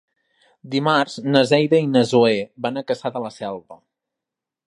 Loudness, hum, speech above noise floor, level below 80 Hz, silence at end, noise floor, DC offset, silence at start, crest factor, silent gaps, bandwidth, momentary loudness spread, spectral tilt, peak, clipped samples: -19 LUFS; none; 67 dB; -66 dBFS; 0.9 s; -86 dBFS; under 0.1%; 0.65 s; 20 dB; none; 11 kHz; 13 LU; -6 dB/octave; 0 dBFS; under 0.1%